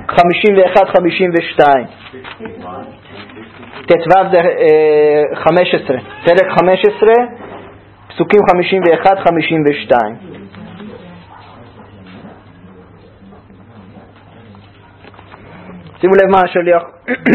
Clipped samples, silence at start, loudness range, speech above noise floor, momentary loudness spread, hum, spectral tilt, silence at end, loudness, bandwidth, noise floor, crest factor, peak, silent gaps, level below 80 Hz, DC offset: 0.2%; 0 s; 7 LU; 29 dB; 23 LU; none; -7.5 dB/octave; 0 s; -11 LUFS; 6.8 kHz; -40 dBFS; 14 dB; 0 dBFS; none; -48 dBFS; under 0.1%